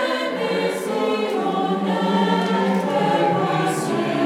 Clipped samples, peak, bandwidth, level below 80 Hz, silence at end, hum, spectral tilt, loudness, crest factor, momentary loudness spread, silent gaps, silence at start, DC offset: under 0.1%; -4 dBFS; 15.5 kHz; -70 dBFS; 0 s; none; -5.5 dB/octave; -21 LUFS; 16 dB; 4 LU; none; 0 s; under 0.1%